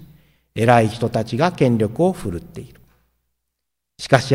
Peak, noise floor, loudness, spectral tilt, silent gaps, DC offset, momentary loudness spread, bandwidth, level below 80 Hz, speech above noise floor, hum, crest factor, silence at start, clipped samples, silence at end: 0 dBFS; -80 dBFS; -18 LUFS; -6.5 dB/octave; none; under 0.1%; 18 LU; 16 kHz; -48 dBFS; 62 dB; none; 20 dB; 0 s; under 0.1%; 0 s